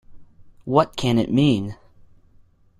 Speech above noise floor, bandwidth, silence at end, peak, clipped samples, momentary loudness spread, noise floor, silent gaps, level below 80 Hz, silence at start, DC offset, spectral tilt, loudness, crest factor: 35 dB; 13.5 kHz; 1.05 s; -2 dBFS; under 0.1%; 13 LU; -54 dBFS; none; -48 dBFS; 0.1 s; under 0.1%; -7 dB/octave; -20 LUFS; 20 dB